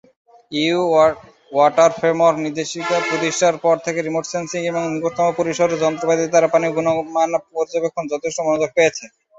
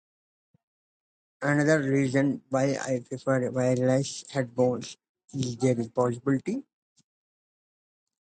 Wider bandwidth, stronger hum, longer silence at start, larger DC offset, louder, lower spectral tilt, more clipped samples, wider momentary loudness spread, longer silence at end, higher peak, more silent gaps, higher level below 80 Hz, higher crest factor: second, 8 kHz vs 9.4 kHz; neither; second, 0.5 s vs 1.4 s; neither; first, -18 LUFS vs -27 LUFS; second, -4 dB/octave vs -6 dB/octave; neither; about the same, 8 LU vs 10 LU; second, 0.3 s vs 1.75 s; first, -2 dBFS vs -10 dBFS; second, none vs 5.09-5.15 s; first, -62 dBFS vs -68 dBFS; about the same, 16 dB vs 18 dB